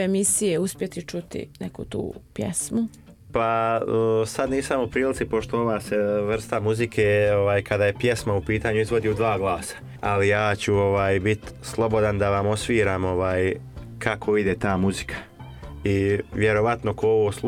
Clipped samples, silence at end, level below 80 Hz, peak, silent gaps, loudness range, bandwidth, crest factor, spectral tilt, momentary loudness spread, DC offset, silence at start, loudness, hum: under 0.1%; 0 s; -46 dBFS; -6 dBFS; none; 3 LU; 16 kHz; 16 dB; -5 dB/octave; 12 LU; under 0.1%; 0 s; -23 LUFS; none